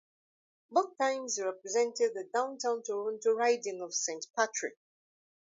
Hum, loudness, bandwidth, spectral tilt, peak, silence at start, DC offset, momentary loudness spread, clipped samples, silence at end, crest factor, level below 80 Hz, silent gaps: none; -32 LUFS; 7.8 kHz; -1 dB/octave; -12 dBFS; 0.7 s; under 0.1%; 6 LU; under 0.1%; 0.85 s; 20 dB; under -90 dBFS; 4.30-4.34 s